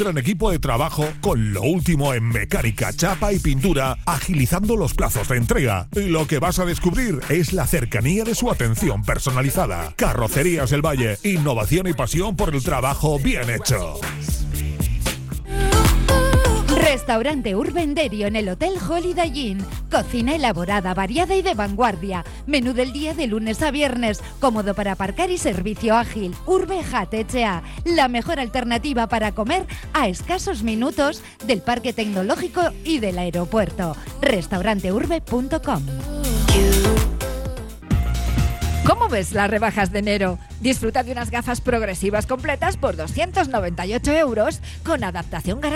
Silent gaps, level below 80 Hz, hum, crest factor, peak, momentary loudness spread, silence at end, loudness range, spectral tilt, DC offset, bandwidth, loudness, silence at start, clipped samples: none; -28 dBFS; none; 16 dB; -4 dBFS; 6 LU; 0 s; 3 LU; -5 dB/octave; under 0.1%; 17 kHz; -21 LUFS; 0 s; under 0.1%